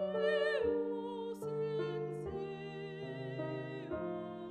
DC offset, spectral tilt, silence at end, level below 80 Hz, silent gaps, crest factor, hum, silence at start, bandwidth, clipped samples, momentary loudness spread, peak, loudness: under 0.1%; -7 dB/octave; 0 s; -66 dBFS; none; 16 dB; none; 0 s; 12.5 kHz; under 0.1%; 11 LU; -22 dBFS; -39 LUFS